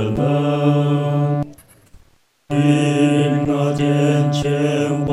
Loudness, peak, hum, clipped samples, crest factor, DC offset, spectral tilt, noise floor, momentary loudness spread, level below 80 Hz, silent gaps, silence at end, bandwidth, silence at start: -17 LUFS; -4 dBFS; none; under 0.1%; 14 dB; under 0.1%; -7 dB/octave; -54 dBFS; 4 LU; -46 dBFS; none; 0 s; 12 kHz; 0 s